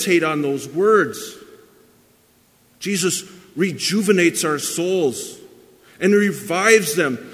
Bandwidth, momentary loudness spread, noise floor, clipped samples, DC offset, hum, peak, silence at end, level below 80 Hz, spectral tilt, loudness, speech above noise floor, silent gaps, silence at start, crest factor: 16 kHz; 14 LU; -56 dBFS; under 0.1%; under 0.1%; none; 0 dBFS; 0 s; -68 dBFS; -4 dB/octave; -18 LUFS; 38 dB; none; 0 s; 20 dB